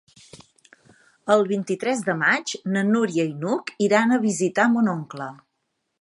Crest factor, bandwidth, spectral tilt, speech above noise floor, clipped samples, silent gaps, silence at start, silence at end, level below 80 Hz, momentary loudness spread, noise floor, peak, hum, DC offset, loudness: 20 dB; 11.5 kHz; -5 dB/octave; 54 dB; under 0.1%; none; 0.35 s; 0.65 s; -72 dBFS; 10 LU; -76 dBFS; -4 dBFS; none; under 0.1%; -22 LUFS